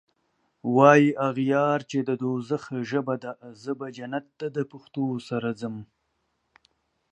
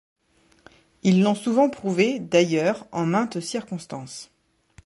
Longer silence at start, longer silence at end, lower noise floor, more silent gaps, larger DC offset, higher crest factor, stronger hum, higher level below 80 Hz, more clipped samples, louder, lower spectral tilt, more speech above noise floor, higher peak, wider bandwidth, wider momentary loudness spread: second, 0.65 s vs 1.05 s; first, 1.25 s vs 0.6 s; first, -75 dBFS vs -61 dBFS; neither; neither; first, 24 dB vs 18 dB; neither; second, -74 dBFS vs -64 dBFS; neither; about the same, -25 LUFS vs -23 LUFS; about the same, -7 dB/octave vs -6 dB/octave; first, 50 dB vs 39 dB; first, -2 dBFS vs -6 dBFS; second, 8.6 kHz vs 11.5 kHz; about the same, 16 LU vs 15 LU